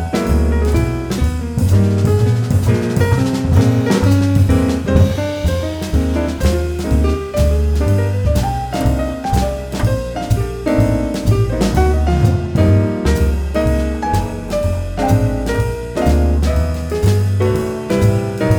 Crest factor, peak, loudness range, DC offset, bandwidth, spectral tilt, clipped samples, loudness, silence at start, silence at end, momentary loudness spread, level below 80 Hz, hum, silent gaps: 14 dB; -2 dBFS; 3 LU; under 0.1%; 19.5 kHz; -7 dB/octave; under 0.1%; -16 LUFS; 0 s; 0 s; 6 LU; -22 dBFS; none; none